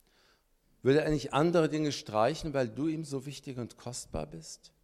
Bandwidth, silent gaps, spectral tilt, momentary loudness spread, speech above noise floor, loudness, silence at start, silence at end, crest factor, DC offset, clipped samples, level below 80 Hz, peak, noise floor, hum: 14.5 kHz; none; -5.5 dB/octave; 14 LU; 38 dB; -31 LUFS; 0.85 s; 0.15 s; 18 dB; under 0.1%; under 0.1%; -54 dBFS; -14 dBFS; -69 dBFS; none